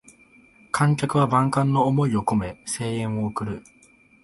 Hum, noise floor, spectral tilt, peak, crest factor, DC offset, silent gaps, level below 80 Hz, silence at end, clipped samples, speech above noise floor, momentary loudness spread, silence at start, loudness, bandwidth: none; -54 dBFS; -6.5 dB/octave; -6 dBFS; 18 dB; under 0.1%; none; -52 dBFS; 0.65 s; under 0.1%; 32 dB; 10 LU; 0.75 s; -23 LUFS; 11.5 kHz